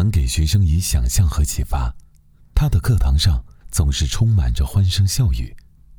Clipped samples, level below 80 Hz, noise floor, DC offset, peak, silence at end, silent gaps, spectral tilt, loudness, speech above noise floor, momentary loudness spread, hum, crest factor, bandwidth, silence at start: under 0.1%; -22 dBFS; -49 dBFS; under 0.1%; -4 dBFS; 0.4 s; none; -5 dB/octave; -19 LUFS; 32 dB; 8 LU; none; 14 dB; 18.5 kHz; 0 s